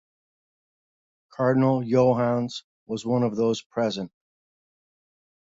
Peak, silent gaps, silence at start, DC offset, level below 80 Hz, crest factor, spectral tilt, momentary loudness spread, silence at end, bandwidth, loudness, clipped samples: -8 dBFS; 2.64-2.86 s, 3.66-3.70 s; 1.4 s; under 0.1%; -66 dBFS; 18 dB; -7 dB/octave; 14 LU; 1.5 s; 7.8 kHz; -24 LUFS; under 0.1%